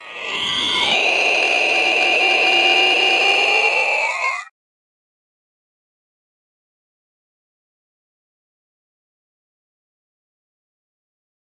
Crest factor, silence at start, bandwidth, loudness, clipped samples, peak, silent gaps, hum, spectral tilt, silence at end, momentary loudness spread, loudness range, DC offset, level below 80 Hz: 18 dB; 0 s; 11.5 kHz; -14 LUFS; under 0.1%; -2 dBFS; none; none; -0.5 dB/octave; 7.05 s; 8 LU; 11 LU; under 0.1%; -66 dBFS